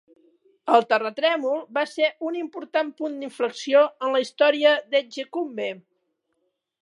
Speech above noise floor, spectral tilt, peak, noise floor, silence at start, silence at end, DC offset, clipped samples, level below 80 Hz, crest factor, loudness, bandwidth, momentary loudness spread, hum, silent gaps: 52 dB; -3 dB/octave; -4 dBFS; -75 dBFS; 0.65 s; 1.05 s; under 0.1%; under 0.1%; -86 dBFS; 20 dB; -23 LUFS; 11 kHz; 12 LU; none; none